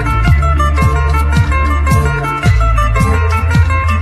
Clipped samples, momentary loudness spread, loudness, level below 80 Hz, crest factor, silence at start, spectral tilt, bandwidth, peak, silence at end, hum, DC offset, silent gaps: under 0.1%; 2 LU; -12 LUFS; -14 dBFS; 10 dB; 0 s; -6.5 dB/octave; 13.5 kHz; 0 dBFS; 0 s; none; under 0.1%; none